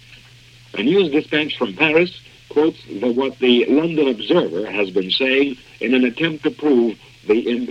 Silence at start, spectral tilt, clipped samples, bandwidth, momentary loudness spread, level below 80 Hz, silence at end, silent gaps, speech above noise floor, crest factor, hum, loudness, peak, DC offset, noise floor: 0.1 s; -6.5 dB/octave; under 0.1%; 8.6 kHz; 7 LU; -58 dBFS; 0 s; none; 28 dB; 18 dB; none; -18 LUFS; 0 dBFS; under 0.1%; -46 dBFS